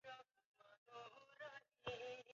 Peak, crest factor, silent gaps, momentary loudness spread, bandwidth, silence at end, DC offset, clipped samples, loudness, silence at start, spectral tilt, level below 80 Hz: -34 dBFS; 24 dB; 0.45-0.54 s, 0.78-0.86 s; 10 LU; 7.4 kHz; 0 s; under 0.1%; under 0.1%; -56 LUFS; 0.05 s; -1 dB/octave; -84 dBFS